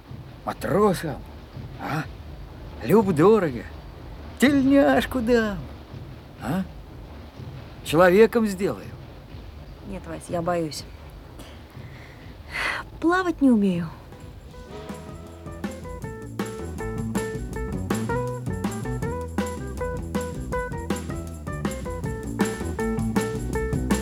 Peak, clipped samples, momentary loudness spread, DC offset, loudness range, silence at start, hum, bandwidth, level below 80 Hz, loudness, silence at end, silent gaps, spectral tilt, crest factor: -4 dBFS; under 0.1%; 23 LU; under 0.1%; 11 LU; 0.05 s; none; 17.5 kHz; -40 dBFS; -25 LUFS; 0 s; none; -6 dB/octave; 22 dB